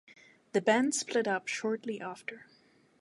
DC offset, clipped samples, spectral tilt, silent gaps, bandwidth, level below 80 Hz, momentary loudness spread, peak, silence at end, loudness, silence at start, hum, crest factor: under 0.1%; under 0.1%; -3 dB/octave; none; 11.5 kHz; -84 dBFS; 16 LU; -12 dBFS; 0.6 s; -31 LUFS; 0.55 s; none; 22 dB